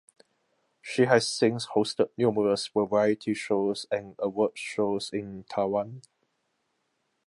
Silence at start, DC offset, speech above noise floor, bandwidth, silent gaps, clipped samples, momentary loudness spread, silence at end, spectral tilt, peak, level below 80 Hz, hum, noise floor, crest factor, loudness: 0.85 s; under 0.1%; 50 dB; 11.5 kHz; none; under 0.1%; 11 LU; 1.25 s; -5 dB/octave; -6 dBFS; -68 dBFS; none; -76 dBFS; 22 dB; -27 LUFS